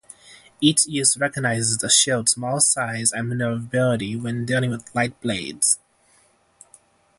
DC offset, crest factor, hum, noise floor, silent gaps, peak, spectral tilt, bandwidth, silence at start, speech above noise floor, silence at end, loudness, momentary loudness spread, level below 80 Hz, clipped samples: under 0.1%; 20 dB; none; -59 dBFS; none; -2 dBFS; -3 dB/octave; 12 kHz; 0.25 s; 38 dB; 1.45 s; -20 LUFS; 9 LU; -58 dBFS; under 0.1%